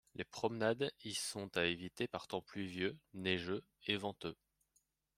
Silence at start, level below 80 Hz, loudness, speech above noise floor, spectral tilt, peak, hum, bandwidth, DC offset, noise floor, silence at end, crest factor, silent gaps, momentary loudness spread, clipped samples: 0.15 s; -76 dBFS; -41 LUFS; 39 dB; -4 dB/octave; -18 dBFS; none; 16 kHz; under 0.1%; -81 dBFS; 0.85 s; 24 dB; none; 8 LU; under 0.1%